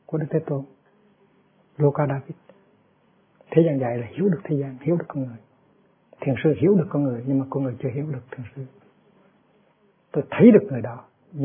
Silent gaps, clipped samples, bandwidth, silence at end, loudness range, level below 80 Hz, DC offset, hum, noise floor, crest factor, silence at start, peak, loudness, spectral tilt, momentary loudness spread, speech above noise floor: none; under 0.1%; 3.6 kHz; 0 s; 6 LU; -66 dBFS; under 0.1%; none; -62 dBFS; 22 dB; 0.1 s; -2 dBFS; -22 LUFS; -13 dB/octave; 20 LU; 40 dB